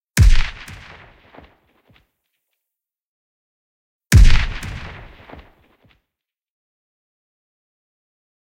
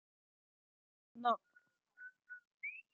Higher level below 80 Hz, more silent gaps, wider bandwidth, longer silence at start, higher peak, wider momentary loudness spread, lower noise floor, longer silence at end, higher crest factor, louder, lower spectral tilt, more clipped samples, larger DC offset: first, -20 dBFS vs under -90 dBFS; first, 3.04-4.01 s vs 2.47-2.58 s; first, 16 kHz vs 7 kHz; second, 0.15 s vs 1.15 s; first, 0 dBFS vs -22 dBFS; first, 26 LU vs 19 LU; first, -84 dBFS vs -74 dBFS; first, 3.65 s vs 0.15 s; second, 20 dB vs 26 dB; first, -17 LUFS vs -41 LUFS; first, -4.5 dB/octave vs -0.5 dB/octave; neither; neither